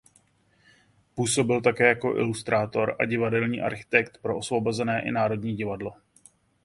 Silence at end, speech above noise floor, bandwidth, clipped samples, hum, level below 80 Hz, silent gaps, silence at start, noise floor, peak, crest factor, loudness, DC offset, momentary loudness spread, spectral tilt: 0.7 s; 39 dB; 11.5 kHz; under 0.1%; none; -60 dBFS; none; 1.15 s; -64 dBFS; -4 dBFS; 24 dB; -25 LUFS; under 0.1%; 9 LU; -5 dB/octave